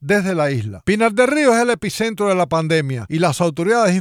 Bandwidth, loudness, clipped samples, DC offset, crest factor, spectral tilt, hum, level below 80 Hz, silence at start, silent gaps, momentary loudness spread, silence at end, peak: 16 kHz; -17 LUFS; under 0.1%; under 0.1%; 16 dB; -5.5 dB/octave; none; -50 dBFS; 0 s; none; 6 LU; 0 s; -2 dBFS